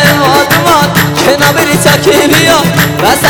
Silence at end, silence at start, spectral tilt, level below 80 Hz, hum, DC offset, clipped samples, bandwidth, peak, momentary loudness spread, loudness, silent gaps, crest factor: 0 s; 0 s; -4 dB/octave; -34 dBFS; none; under 0.1%; 2%; over 20 kHz; 0 dBFS; 3 LU; -6 LUFS; none; 6 dB